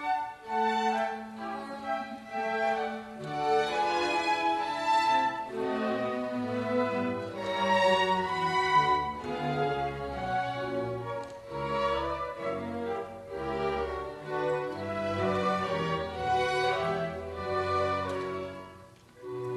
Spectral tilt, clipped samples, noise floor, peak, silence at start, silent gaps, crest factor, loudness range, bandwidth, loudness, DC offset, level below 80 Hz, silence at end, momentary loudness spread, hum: -5 dB/octave; under 0.1%; -52 dBFS; -12 dBFS; 0 s; none; 18 dB; 5 LU; 13 kHz; -30 LUFS; under 0.1%; -56 dBFS; 0 s; 12 LU; none